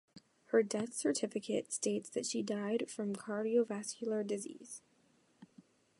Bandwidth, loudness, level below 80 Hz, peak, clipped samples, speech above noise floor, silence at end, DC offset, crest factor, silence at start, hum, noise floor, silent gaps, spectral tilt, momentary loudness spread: 11.5 kHz; -37 LUFS; -86 dBFS; -18 dBFS; under 0.1%; 35 dB; 0.55 s; under 0.1%; 20 dB; 0.15 s; none; -72 dBFS; none; -4 dB/octave; 8 LU